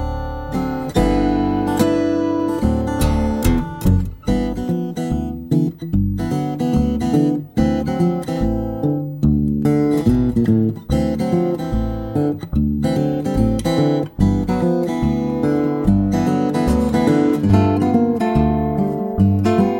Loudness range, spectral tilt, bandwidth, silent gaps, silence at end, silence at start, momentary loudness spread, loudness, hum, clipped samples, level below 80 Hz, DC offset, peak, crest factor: 3 LU; -8 dB/octave; 16.5 kHz; none; 0 s; 0 s; 6 LU; -18 LUFS; none; under 0.1%; -28 dBFS; under 0.1%; -2 dBFS; 16 dB